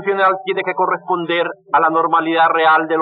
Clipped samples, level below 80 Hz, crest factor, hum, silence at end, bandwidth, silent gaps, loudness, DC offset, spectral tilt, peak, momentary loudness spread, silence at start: under 0.1%; -84 dBFS; 12 dB; none; 0 s; 4.9 kHz; none; -16 LUFS; under 0.1%; -1.5 dB/octave; -2 dBFS; 7 LU; 0 s